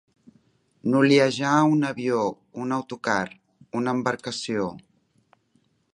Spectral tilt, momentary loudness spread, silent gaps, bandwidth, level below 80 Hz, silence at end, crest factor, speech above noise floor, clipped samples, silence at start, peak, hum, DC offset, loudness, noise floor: -5.5 dB/octave; 13 LU; none; 11 kHz; -68 dBFS; 1.15 s; 20 dB; 44 dB; under 0.1%; 0.85 s; -4 dBFS; none; under 0.1%; -24 LUFS; -67 dBFS